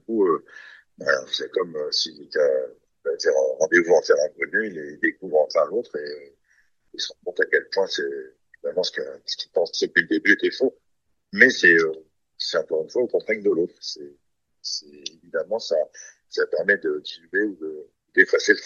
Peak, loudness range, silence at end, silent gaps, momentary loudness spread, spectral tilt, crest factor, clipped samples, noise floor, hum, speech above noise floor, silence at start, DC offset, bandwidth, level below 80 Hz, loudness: 0 dBFS; 7 LU; 0 s; none; 15 LU; -3 dB/octave; 24 dB; under 0.1%; -75 dBFS; none; 52 dB; 0.1 s; under 0.1%; 7.2 kHz; -74 dBFS; -22 LUFS